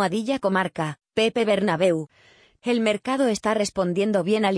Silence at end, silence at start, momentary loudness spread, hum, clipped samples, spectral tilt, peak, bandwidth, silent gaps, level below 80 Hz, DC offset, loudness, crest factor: 0 s; 0 s; 7 LU; none; under 0.1%; -5 dB/octave; -8 dBFS; 10.5 kHz; none; -62 dBFS; under 0.1%; -23 LUFS; 14 dB